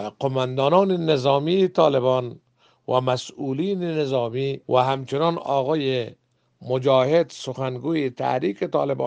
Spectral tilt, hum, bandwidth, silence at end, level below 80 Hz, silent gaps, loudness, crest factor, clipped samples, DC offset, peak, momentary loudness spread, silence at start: -6.5 dB/octave; none; 9.2 kHz; 0 s; -66 dBFS; none; -22 LUFS; 18 dB; under 0.1%; under 0.1%; -4 dBFS; 9 LU; 0 s